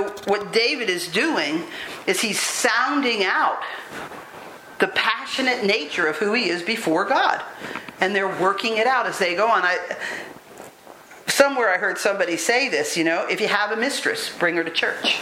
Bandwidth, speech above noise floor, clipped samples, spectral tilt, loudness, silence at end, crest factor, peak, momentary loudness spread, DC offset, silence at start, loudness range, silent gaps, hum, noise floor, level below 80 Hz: 16.5 kHz; 23 dB; under 0.1%; -2 dB/octave; -21 LUFS; 0 s; 22 dB; 0 dBFS; 13 LU; under 0.1%; 0 s; 2 LU; none; none; -44 dBFS; -70 dBFS